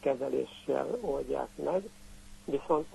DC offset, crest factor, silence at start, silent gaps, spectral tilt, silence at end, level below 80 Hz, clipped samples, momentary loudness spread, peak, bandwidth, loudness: under 0.1%; 18 dB; 0 s; none; -6 dB/octave; 0 s; -56 dBFS; under 0.1%; 12 LU; -16 dBFS; 12 kHz; -34 LUFS